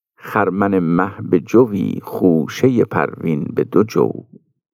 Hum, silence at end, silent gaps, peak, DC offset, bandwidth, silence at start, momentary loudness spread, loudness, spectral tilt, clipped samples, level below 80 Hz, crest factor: none; 0.55 s; none; 0 dBFS; under 0.1%; 16 kHz; 0.25 s; 7 LU; -17 LUFS; -8 dB/octave; under 0.1%; -58 dBFS; 16 dB